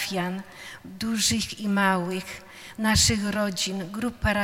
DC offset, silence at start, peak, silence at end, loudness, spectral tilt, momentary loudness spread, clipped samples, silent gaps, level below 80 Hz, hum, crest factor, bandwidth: under 0.1%; 0 s; -8 dBFS; 0 s; -25 LUFS; -3 dB/octave; 20 LU; under 0.1%; none; -44 dBFS; none; 20 dB; 16.5 kHz